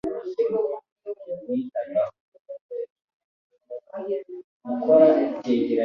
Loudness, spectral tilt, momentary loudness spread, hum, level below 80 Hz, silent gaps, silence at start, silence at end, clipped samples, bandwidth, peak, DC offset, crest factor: -24 LUFS; -8 dB/octave; 22 LU; none; -68 dBFS; 0.92-0.96 s, 2.20-2.32 s, 2.40-2.45 s, 2.61-2.69 s, 2.90-2.96 s, 3.04-3.08 s, 3.14-3.50 s, 4.44-4.60 s; 0.05 s; 0 s; under 0.1%; 6.2 kHz; -4 dBFS; under 0.1%; 20 dB